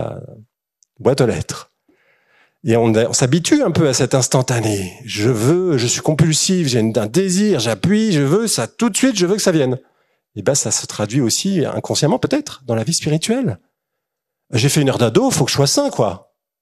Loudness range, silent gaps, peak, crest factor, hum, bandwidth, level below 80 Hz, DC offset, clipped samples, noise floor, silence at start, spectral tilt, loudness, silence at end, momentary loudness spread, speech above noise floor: 3 LU; none; 0 dBFS; 16 dB; none; 14 kHz; -52 dBFS; under 0.1%; under 0.1%; -79 dBFS; 0 s; -4.5 dB/octave; -16 LUFS; 0.45 s; 8 LU; 63 dB